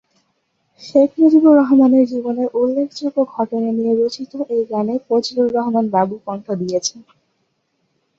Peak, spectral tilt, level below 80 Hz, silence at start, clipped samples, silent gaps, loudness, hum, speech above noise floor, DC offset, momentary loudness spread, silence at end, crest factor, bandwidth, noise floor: -2 dBFS; -5.5 dB/octave; -64 dBFS; 0.8 s; under 0.1%; none; -16 LUFS; none; 52 dB; under 0.1%; 11 LU; 1.15 s; 16 dB; 7.8 kHz; -68 dBFS